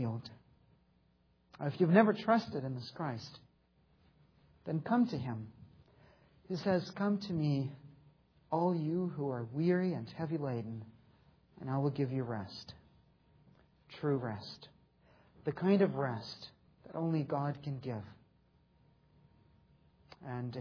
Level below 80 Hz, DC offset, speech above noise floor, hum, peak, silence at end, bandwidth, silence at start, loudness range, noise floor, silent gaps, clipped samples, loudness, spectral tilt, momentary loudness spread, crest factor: -72 dBFS; under 0.1%; 37 dB; none; -12 dBFS; 0 s; 5.4 kHz; 0 s; 7 LU; -71 dBFS; none; under 0.1%; -35 LUFS; -7 dB/octave; 19 LU; 26 dB